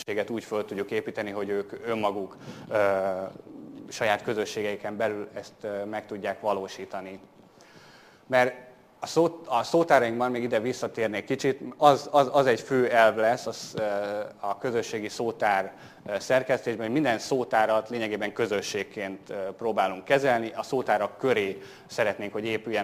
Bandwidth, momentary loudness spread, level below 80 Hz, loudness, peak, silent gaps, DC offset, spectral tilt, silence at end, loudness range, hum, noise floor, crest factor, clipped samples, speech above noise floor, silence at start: 15.5 kHz; 14 LU; -70 dBFS; -27 LUFS; -4 dBFS; none; under 0.1%; -4.5 dB/octave; 0 s; 7 LU; none; -53 dBFS; 24 dB; under 0.1%; 26 dB; 0 s